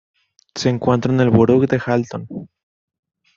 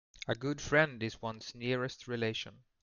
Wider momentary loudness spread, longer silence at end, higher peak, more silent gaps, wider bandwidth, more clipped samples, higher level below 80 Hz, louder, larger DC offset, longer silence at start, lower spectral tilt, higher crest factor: first, 19 LU vs 12 LU; first, 0.9 s vs 0.25 s; first, -2 dBFS vs -14 dBFS; neither; about the same, 7.6 kHz vs 7.4 kHz; neither; first, -52 dBFS vs -60 dBFS; first, -17 LUFS vs -35 LUFS; neither; first, 0.55 s vs 0.15 s; first, -7 dB/octave vs -5 dB/octave; about the same, 18 dB vs 22 dB